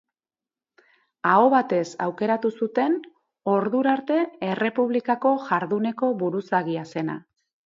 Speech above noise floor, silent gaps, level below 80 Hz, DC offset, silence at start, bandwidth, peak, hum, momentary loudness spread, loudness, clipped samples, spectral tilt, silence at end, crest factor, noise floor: over 67 dB; none; -74 dBFS; under 0.1%; 1.25 s; 7.6 kHz; -4 dBFS; none; 10 LU; -23 LUFS; under 0.1%; -7 dB/octave; 0.55 s; 20 dB; under -90 dBFS